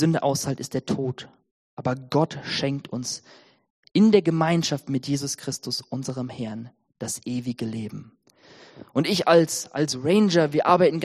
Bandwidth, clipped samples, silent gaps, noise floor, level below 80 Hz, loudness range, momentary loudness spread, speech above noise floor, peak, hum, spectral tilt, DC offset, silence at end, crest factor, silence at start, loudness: 14 kHz; under 0.1%; 1.51-1.77 s, 3.70-3.83 s; -52 dBFS; -64 dBFS; 8 LU; 15 LU; 29 dB; -4 dBFS; none; -5 dB/octave; under 0.1%; 0 s; 20 dB; 0 s; -24 LUFS